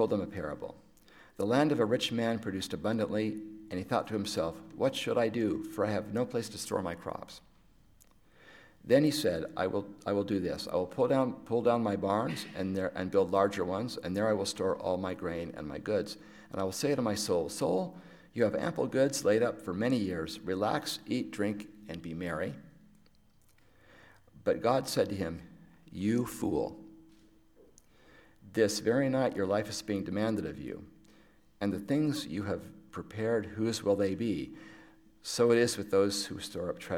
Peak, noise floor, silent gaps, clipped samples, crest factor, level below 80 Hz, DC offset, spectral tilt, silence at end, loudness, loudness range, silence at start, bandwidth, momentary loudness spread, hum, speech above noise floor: -12 dBFS; -63 dBFS; none; under 0.1%; 20 dB; -64 dBFS; under 0.1%; -5 dB/octave; 0 s; -32 LUFS; 5 LU; 0 s; 17 kHz; 13 LU; none; 31 dB